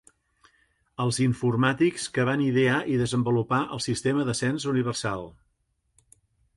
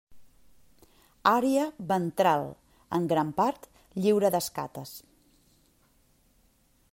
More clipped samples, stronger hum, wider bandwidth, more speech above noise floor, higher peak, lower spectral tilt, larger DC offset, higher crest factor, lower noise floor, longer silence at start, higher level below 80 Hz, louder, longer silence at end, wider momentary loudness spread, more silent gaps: neither; neither; second, 11.5 kHz vs 16 kHz; first, 48 dB vs 39 dB; second, -10 dBFS vs -6 dBFS; about the same, -5.5 dB/octave vs -5.5 dB/octave; neither; second, 16 dB vs 24 dB; first, -73 dBFS vs -66 dBFS; first, 1 s vs 0.1 s; first, -58 dBFS vs -66 dBFS; about the same, -25 LUFS vs -27 LUFS; second, 1.25 s vs 1.95 s; second, 7 LU vs 16 LU; neither